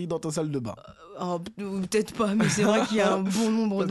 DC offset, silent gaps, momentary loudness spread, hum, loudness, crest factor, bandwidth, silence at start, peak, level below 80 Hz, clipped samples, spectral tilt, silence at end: under 0.1%; none; 12 LU; none; -26 LUFS; 16 dB; 12.5 kHz; 0 s; -10 dBFS; -60 dBFS; under 0.1%; -5 dB/octave; 0 s